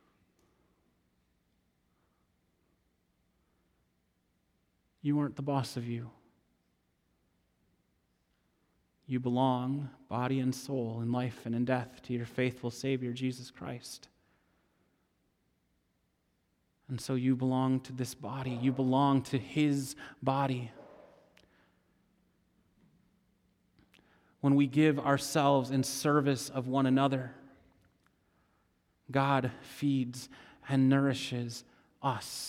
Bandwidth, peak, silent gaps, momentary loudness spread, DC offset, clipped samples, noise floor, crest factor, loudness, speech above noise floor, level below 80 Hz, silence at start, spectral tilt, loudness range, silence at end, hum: 16 kHz; -12 dBFS; none; 14 LU; under 0.1%; under 0.1%; -77 dBFS; 22 dB; -32 LUFS; 45 dB; -72 dBFS; 5.05 s; -6 dB/octave; 12 LU; 0 s; none